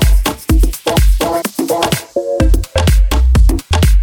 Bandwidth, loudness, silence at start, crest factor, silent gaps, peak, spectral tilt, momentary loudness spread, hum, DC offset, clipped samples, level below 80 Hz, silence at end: 18.5 kHz; -14 LUFS; 0 s; 10 dB; none; 0 dBFS; -5.5 dB/octave; 4 LU; none; under 0.1%; under 0.1%; -12 dBFS; 0 s